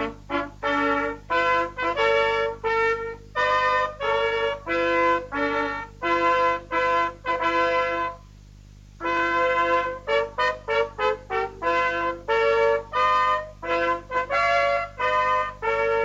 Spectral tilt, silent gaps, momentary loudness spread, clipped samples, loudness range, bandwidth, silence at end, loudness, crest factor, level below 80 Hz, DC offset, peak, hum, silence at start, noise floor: -4.5 dB/octave; none; 7 LU; under 0.1%; 2 LU; 8 kHz; 0 s; -23 LUFS; 14 dB; -48 dBFS; under 0.1%; -10 dBFS; 50 Hz at -45 dBFS; 0 s; -46 dBFS